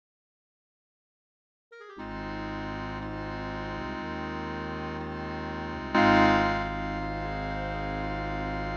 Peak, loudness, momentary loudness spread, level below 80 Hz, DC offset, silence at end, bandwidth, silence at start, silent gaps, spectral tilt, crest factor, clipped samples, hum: -8 dBFS; -30 LUFS; 13 LU; -44 dBFS; under 0.1%; 0 s; 8 kHz; 1.7 s; none; -6.5 dB/octave; 22 dB; under 0.1%; none